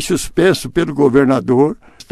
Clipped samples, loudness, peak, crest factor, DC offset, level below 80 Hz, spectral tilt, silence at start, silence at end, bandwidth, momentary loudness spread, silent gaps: under 0.1%; -14 LUFS; 0 dBFS; 14 dB; under 0.1%; -40 dBFS; -5.5 dB/octave; 0 s; 0.4 s; 14 kHz; 6 LU; none